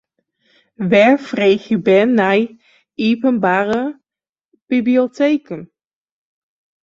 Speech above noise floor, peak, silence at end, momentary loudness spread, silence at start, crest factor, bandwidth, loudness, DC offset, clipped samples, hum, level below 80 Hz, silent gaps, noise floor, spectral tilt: over 75 dB; -2 dBFS; 1.2 s; 13 LU; 0.8 s; 16 dB; 7.6 kHz; -15 LUFS; under 0.1%; under 0.1%; none; -62 dBFS; 4.29-4.33 s, 4.45-4.49 s, 4.62-4.67 s; under -90 dBFS; -7 dB/octave